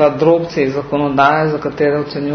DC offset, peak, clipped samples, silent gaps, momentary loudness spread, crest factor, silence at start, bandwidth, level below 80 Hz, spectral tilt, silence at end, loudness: under 0.1%; 0 dBFS; under 0.1%; none; 6 LU; 14 dB; 0 s; 6.4 kHz; -48 dBFS; -7.5 dB/octave; 0 s; -15 LUFS